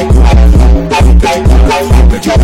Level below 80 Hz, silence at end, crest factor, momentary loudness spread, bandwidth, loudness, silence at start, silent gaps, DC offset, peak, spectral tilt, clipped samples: -6 dBFS; 0 s; 4 dB; 2 LU; 12 kHz; -7 LUFS; 0 s; none; 2%; 0 dBFS; -6.5 dB/octave; 1%